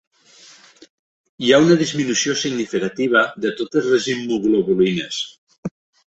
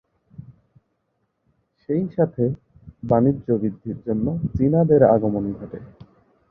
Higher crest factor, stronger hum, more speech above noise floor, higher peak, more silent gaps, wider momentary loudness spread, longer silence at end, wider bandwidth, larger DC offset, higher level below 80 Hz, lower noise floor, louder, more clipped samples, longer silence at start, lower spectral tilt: about the same, 18 dB vs 20 dB; neither; second, 30 dB vs 52 dB; about the same, 0 dBFS vs -2 dBFS; first, 5.38-5.47 s, 5.58-5.63 s vs none; second, 14 LU vs 19 LU; second, 0.45 s vs 0.6 s; first, 8.2 kHz vs 2.5 kHz; neither; second, -58 dBFS vs -48 dBFS; second, -48 dBFS vs -72 dBFS; first, -18 LUFS vs -21 LUFS; neither; first, 1.4 s vs 0.4 s; second, -4 dB/octave vs -13 dB/octave